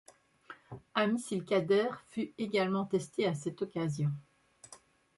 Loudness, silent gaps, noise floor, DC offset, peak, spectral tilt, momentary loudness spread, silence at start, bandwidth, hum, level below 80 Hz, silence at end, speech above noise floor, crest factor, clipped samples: -33 LUFS; none; -59 dBFS; under 0.1%; -16 dBFS; -6 dB/octave; 22 LU; 0.5 s; 11.5 kHz; none; -74 dBFS; 0.4 s; 27 dB; 20 dB; under 0.1%